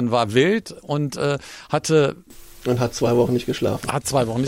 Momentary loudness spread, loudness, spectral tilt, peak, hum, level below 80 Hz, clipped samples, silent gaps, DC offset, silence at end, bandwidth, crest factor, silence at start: 8 LU; -21 LUFS; -5.5 dB/octave; -6 dBFS; none; -48 dBFS; under 0.1%; none; under 0.1%; 0 s; 16 kHz; 16 dB; 0 s